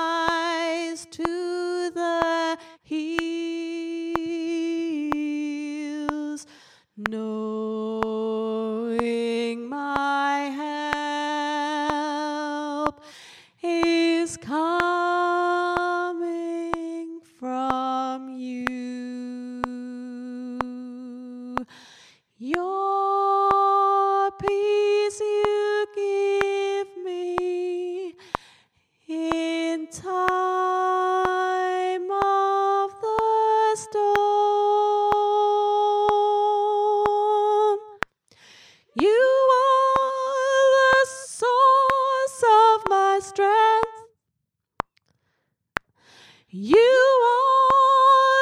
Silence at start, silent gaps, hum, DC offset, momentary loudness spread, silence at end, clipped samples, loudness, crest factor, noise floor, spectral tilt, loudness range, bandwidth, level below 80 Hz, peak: 0 s; none; none; under 0.1%; 15 LU; 0 s; under 0.1%; -23 LUFS; 22 dB; -80 dBFS; -4 dB/octave; 10 LU; 12 kHz; -58 dBFS; -2 dBFS